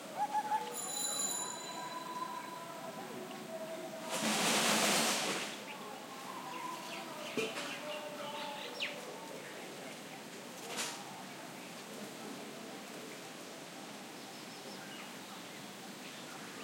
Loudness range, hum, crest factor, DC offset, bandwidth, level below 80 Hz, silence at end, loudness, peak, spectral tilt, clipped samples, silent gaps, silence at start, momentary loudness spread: 13 LU; none; 22 dB; under 0.1%; 16.5 kHz; under -90 dBFS; 0 s; -39 LUFS; -18 dBFS; -1.5 dB/octave; under 0.1%; none; 0 s; 15 LU